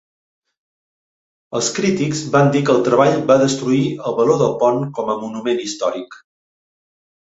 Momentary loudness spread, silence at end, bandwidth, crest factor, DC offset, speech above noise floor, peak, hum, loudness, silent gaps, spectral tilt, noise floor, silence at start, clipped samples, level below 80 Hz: 8 LU; 1.1 s; 8 kHz; 16 dB; under 0.1%; over 74 dB; -2 dBFS; none; -17 LUFS; none; -5.5 dB/octave; under -90 dBFS; 1.5 s; under 0.1%; -58 dBFS